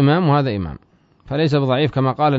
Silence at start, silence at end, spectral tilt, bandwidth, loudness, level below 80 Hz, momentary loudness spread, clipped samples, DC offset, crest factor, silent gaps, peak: 0 s; 0 s; -8.5 dB/octave; 7 kHz; -18 LUFS; -46 dBFS; 11 LU; under 0.1%; under 0.1%; 14 dB; none; -4 dBFS